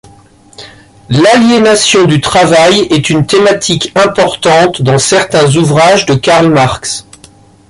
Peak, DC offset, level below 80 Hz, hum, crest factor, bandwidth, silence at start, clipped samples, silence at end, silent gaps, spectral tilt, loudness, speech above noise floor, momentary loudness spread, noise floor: 0 dBFS; under 0.1%; -40 dBFS; none; 8 dB; 11.5 kHz; 0.6 s; under 0.1%; 0.7 s; none; -4.5 dB/octave; -7 LUFS; 32 dB; 5 LU; -39 dBFS